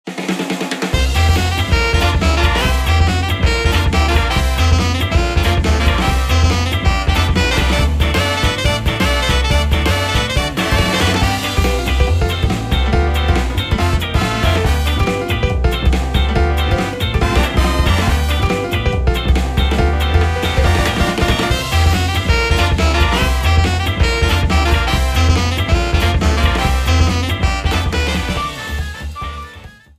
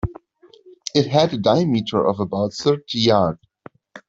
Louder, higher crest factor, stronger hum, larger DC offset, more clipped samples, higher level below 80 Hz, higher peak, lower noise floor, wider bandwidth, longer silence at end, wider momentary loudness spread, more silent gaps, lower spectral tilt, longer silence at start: first, -15 LUFS vs -19 LUFS; about the same, 14 dB vs 18 dB; neither; neither; neither; first, -18 dBFS vs -46 dBFS; about the same, 0 dBFS vs -2 dBFS; second, -37 dBFS vs -52 dBFS; first, 15.5 kHz vs 7.8 kHz; first, 0.3 s vs 0.1 s; second, 3 LU vs 7 LU; neither; about the same, -5 dB/octave vs -6 dB/octave; about the same, 0.05 s vs 0.05 s